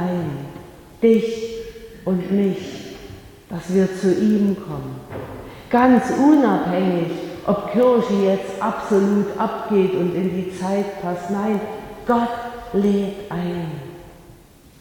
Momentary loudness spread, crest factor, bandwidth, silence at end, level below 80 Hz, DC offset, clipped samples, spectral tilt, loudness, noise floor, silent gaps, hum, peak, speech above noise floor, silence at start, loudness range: 17 LU; 18 dB; 18.5 kHz; 0.45 s; -50 dBFS; under 0.1%; under 0.1%; -7.5 dB/octave; -20 LUFS; -47 dBFS; none; none; -2 dBFS; 28 dB; 0 s; 5 LU